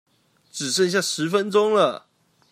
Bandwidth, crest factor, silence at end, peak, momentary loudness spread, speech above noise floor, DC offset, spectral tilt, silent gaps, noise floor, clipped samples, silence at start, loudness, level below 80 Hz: 15.5 kHz; 16 dB; 0.55 s; -6 dBFS; 13 LU; 28 dB; under 0.1%; -3.5 dB/octave; none; -49 dBFS; under 0.1%; 0.55 s; -21 LUFS; -76 dBFS